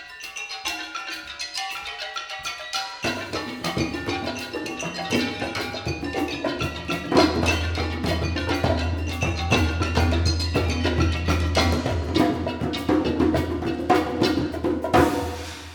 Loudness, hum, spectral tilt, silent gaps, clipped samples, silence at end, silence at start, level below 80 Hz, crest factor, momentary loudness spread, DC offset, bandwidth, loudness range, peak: -24 LUFS; none; -5 dB/octave; none; under 0.1%; 0 s; 0 s; -34 dBFS; 20 dB; 9 LU; under 0.1%; 18.5 kHz; 6 LU; -4 dBFS